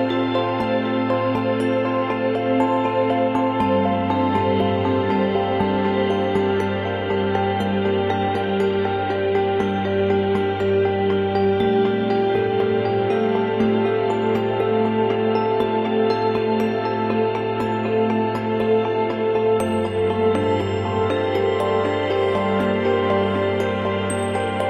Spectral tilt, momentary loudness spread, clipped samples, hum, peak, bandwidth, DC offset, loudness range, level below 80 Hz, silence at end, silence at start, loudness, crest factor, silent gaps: -7 dB/octave; 2 LU; under 0.1%; none; -6 dBFS; 11.5 kHz; under 0.1%; 1 LU; -54 dBFS; 0 s; 0 s; -20 LUFS; 14 dB; none